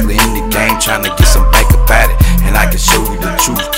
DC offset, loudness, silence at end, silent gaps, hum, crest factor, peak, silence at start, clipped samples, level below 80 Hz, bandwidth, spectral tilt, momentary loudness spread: under 0.1%; -10 LUFS; 0 s; none; none; 10 dB; 0 dBFS; 0 s; 0.7%; -12 dBFS; 16.5 kHz; -3.5 dB/octave; 3 LU